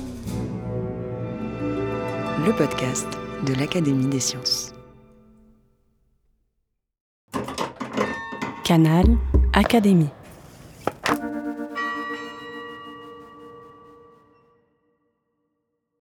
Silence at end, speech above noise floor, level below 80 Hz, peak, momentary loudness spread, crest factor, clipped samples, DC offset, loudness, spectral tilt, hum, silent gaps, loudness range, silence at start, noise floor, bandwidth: 2.45 s; 57 dB; -32 dBFS; -4 dBFS; 19 LU; 22 dB; under 0.1%; under 0.1%; -23 LUFS; -5.5 dB/octave; none; 7.01-7.28 s; 14 LU; 0 s; -76 dBFS; 19 kHz